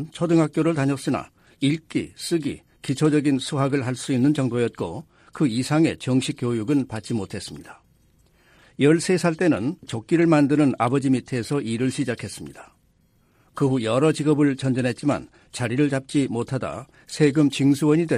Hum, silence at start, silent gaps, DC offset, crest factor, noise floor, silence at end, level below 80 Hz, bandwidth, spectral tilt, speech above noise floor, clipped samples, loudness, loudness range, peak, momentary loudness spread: none; 0 s; none; under 0.1%; 16 dB; -62 dBFS; 0 s; -58 dBFS; 13 kHz; -6.5 dB/octave; 40 dB; under 0.1%; -22 LUFS; 4 LU; -6 dBFS; 13 LU